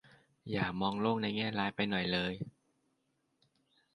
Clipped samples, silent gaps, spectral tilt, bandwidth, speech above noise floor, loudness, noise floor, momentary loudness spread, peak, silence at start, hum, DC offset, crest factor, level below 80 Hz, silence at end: under 0.1%; none; -7 dB/octave; 10.5 kHz; 45 dB; -35 LUFS; -79 dBFS; 11 LU; -18 dBFS; 0.45 s; none; under 0.1%; 20 dB; -64 dBFS; 1.45 s